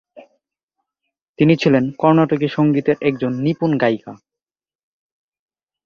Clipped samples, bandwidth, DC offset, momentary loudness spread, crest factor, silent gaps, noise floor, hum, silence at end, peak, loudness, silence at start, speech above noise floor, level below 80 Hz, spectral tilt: under 0.1%; 7 kHz; under 0.1%; 5 LU; 18 dB; 0.63-0.68 s, 1.22-1.34 s; -89 dBFS; none; 1.7 s; -2 dBFS; -17 LUFS; 0.15 s; 73 dB; -58 dBFS; -8 dB/octave